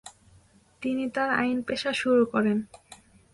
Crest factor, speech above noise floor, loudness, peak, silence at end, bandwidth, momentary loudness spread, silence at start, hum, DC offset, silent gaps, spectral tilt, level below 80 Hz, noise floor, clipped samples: 16 dB; 33 dB; -26 LUFS; -12 dBFS; 0.4 s; 11.5 kHz; 9 LU; 0.05 s; none; under 0.1%; none; -5 dB/octave; -64 dBFS; -59 dBFS; under 0.1%